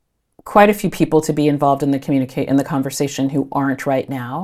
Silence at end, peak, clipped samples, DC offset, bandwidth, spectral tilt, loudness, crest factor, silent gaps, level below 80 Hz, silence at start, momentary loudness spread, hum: 0 s; 0 dBFS; under 0.1%; under 0.1%; 15 kHz; -6 dB/octave; -17 LUFS; 18 dB; none; -48 dBFS; 0.45 s; 7 LU; none